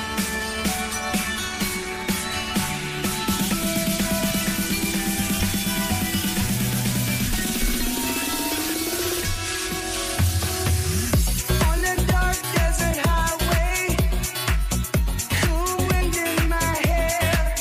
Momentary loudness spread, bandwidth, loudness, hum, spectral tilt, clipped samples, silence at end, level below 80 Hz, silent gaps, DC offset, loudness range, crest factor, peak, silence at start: 4 LU; 16 kHz; -23 LUFS; none; -3.5 dB/octave; under 0.1%; 0 s; -28 dBFS; none; under 0.1%; 2 LU; 14 dB; -10 dBFS; 0 s